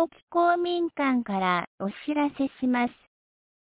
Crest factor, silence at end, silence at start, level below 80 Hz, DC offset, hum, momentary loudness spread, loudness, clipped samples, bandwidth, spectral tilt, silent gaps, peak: 16 dB; 0.7 s; 0 s; -68 dBFS; under 0.1%; none; 6 LU; -27 LUFS; under 0.1%; 4 kHz; -9.5 dB/octave; 0.23-0.27 s, 1.67-1.78 s; -12 dBFS